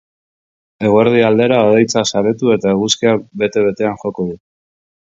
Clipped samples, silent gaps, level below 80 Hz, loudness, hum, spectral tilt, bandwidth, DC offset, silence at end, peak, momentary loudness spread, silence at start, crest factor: under 0.1%; none; -52 dBFS; -14 LUFS; none; -5 dB/octave; 7.8 kHz; under 0.1%; 0.65 s; 0 dBFS; 10 LU; 0.8 s; 14 dB